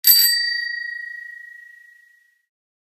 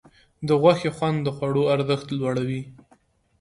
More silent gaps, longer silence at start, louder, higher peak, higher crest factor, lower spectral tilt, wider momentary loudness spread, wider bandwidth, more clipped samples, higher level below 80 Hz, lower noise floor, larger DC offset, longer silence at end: neither; second, 0.05 s vs 0.4 s; first, -17 LUFS vs -23 LUFS; first, 0 dBFS vs -4 dBFS; about the same, 22 dB vs 20 dB; second, 7.5 dB/octave vs -7 dB/octave; first, 25 LU vs 13 LU; first, 17.5 kHz vs 11 kHz; neither; second, -86 dBFS vs -58 dBFS; second, -57 dBFS vs -61 dBFS; neither; first, 1.35 s vs 0.7 s